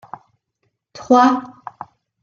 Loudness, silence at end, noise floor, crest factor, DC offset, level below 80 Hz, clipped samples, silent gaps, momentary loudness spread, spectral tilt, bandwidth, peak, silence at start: -15 LUFS; 0.75 s; -71 dBFS; 18 dB; under 0.1%; -64 dBFS; under 0.1%; none; 26 LU; -4.5 dB/octave; 7.2 kHz; -2 dBFS; 0.95 s